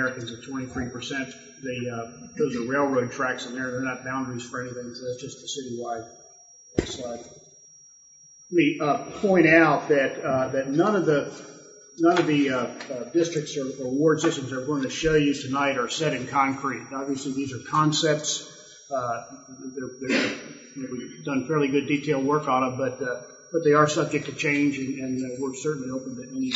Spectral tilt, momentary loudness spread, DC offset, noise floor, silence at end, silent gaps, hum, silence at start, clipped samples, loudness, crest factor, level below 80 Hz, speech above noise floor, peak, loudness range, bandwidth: -5 dB/octave; 14 LU; under 0.1%; -52 dBFS; 0 s; none; none; 0 s; under 0.1%; -25 LUFS; 22 dB; -56 dBFS; 27 dB; -4 dBFS; 10 LU; 8 kHz